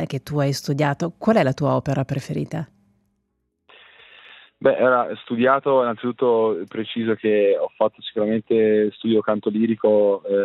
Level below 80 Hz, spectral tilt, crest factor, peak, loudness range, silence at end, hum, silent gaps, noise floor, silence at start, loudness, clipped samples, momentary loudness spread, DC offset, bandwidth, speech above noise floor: -62 dBFS; -7 dB/octave; 16 dB; -4 dBFS; 5 LU; 0 s; none; none; -73 dBFS; 0 s; -21 LUFS; under 0.1%; 8 LU; under 0.1%; 13 kHz; 53 dB